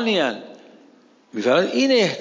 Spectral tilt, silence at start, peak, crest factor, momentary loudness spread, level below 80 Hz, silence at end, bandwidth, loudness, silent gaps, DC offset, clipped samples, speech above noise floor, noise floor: -4 dB/octave; 0 s; -6 dBFS; 16 dB; 15 LU; -76 dBFS; 0 s; 7.6 kHz; -19 LUFS; none; under 0.1%; under 0.1%; 34 dB; -53 dBFS